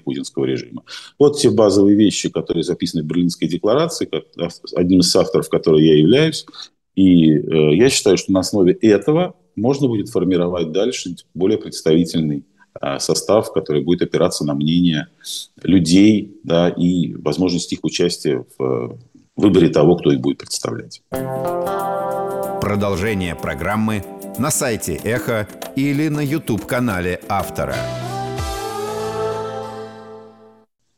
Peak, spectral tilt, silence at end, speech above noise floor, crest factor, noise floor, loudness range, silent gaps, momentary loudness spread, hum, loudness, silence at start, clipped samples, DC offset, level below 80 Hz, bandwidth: -2 dBFS; -5.5 dB/octave; 0.7 s; 36 dB; 16 dB; -53 dBFS; 7 LU; none; 13 LU; none; -17 LUFS; 0.05 s; under 0.1%; under 0.1%; -46 dBFS; 18 kHz